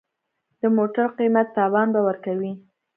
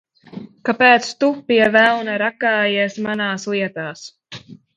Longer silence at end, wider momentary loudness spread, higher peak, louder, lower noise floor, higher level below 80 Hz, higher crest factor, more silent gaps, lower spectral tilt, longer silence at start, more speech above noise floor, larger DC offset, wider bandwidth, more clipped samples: first, 0.35 s vs 0.2 s; second, 8 LU vs 24 LU; second, -6 dBFS vs 0 dBFS; second, -22 LUFS vs -17 LUFS; first, -76 dBFS vs -39 dBFS; second, -76 dBFS vs -64 dBFS; about the same, 16 dB vs 18 dB; neither; first, -11.5 dB/octave vs -4 dB/octave; first, 0.65 s vs 0.35 s; first, 56 dB vs 22 dB; neither; second, 3.4 kHz vs 10 kHz; neither